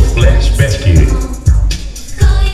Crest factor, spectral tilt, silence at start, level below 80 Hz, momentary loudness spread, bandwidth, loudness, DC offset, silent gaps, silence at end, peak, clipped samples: 10 dB; -5.5 dB/octave; 0 s; -10 dBFS; 8 LU; 12.5 kHz; -12 LUFS; under 0.1%; none; 0 s; 0 dBFS; 0.4%